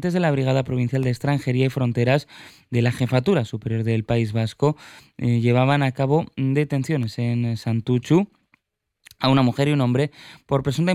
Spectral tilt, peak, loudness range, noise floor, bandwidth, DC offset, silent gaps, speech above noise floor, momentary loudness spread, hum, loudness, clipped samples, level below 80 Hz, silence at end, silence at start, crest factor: -7.5 dB/octave; -6 dBFS; 1 LU; -76 dBFS; 13.5 kHz; under 0.1%; none; 55 dB; 6 LU; none; -22 LUFS; under 0.1%; -52 dBFS; 0 s; 0 s; 16 dB